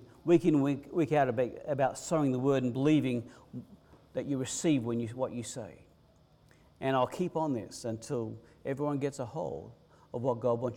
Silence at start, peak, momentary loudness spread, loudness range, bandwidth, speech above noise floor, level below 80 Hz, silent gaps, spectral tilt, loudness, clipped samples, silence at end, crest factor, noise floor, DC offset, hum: 0 s; -14 dBFS; 14 LU; 6 LU; 15.5 kHz; 32 dB; -66 dBFS; none; -6.5 dB/octave; -32 LUFS; under 0.1%; 0 s; 18 dB; -63 dBFS; under 0.1%; none